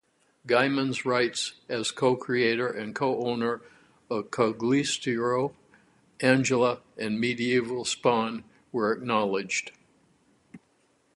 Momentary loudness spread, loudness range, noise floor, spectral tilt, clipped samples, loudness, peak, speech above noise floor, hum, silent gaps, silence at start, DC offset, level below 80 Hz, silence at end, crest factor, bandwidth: 9 LU; 2 LU; -67 dBFS; -4.5 dB/octave; under 0.1%; -27 LUFS; -6 dBFS; 41 dB; none; none; 0.45 s; under 0.1%; -70 dBFS; 0.6 s; 22 dB; 11.5 kHz